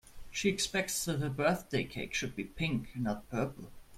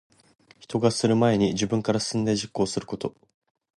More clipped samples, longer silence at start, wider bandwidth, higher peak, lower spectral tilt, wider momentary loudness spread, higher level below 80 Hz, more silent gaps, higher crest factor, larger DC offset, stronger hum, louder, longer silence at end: neither; second, 0.05 s vs 0.6 s; first, 16.5 kHz vs 11.5 kHz; second, -14 dBFS vs -8 dBFS; second, -4 dB/octave vs -5.5 dB/octave; second, 7 LU vs 11 LU; about the same, -56 dBFS vs -56 dBFS; neither; about the same, 20 dB vs 18 dB; neither; neither; second, -34 LUFS vs -25 LUFS; second, 0 s vs 0.65 s